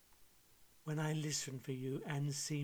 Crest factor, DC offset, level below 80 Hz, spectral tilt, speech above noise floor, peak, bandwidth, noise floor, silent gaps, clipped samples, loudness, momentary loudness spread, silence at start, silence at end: 16 dB; under 0.1%; -76 dBFS; -4.5 dB/octave; 26 dB; -26 dBFS; over 20 kHz; -66 dBFS; none; under 0.1%; -41 LUFS; 6 LU; 0.1 s; 0 s